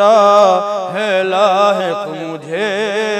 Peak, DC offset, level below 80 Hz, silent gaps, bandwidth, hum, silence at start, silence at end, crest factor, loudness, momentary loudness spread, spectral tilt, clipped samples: 0 dBFS; under 0.1%; -72 dBFS; none; 12 kHz; none; 0 s; 0 s; 12 dB; -13 LUFS; 13 LU; -4 dB/octave; under 0.1%